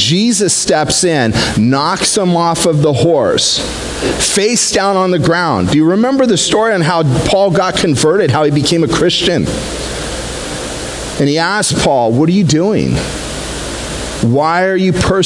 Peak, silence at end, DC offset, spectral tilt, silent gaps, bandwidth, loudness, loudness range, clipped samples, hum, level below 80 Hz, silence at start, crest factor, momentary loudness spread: 0 dBFS; 0 s; under 0.1%; -4 dB/octave; none; 12 kHz; -12 LUFS; 3 LU; under 0.1%; none; -32 dBFS; 0 s; 12 dB; 10 LU